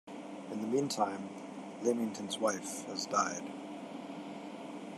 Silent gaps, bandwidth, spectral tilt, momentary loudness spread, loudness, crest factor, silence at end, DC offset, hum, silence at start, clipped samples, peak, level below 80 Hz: none; 14 kHz; -3.5 dB/octave; 12 LU; -37 LUFS; 20 dB; 0 s; under 0.1%; none; 0.05 s; under 0.1%; -16 dBFS; -90 dBFS